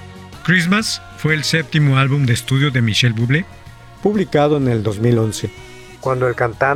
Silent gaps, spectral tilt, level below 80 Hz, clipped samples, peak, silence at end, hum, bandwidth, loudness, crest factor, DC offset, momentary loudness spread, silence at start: none; -5.5 dB/octave; -46 dBFS; under 0.1%; -2 dBFS; 0 s; none; 15 kHz; -17 LUFS; 14 dB; under 0.1%; 11 LU; 0 s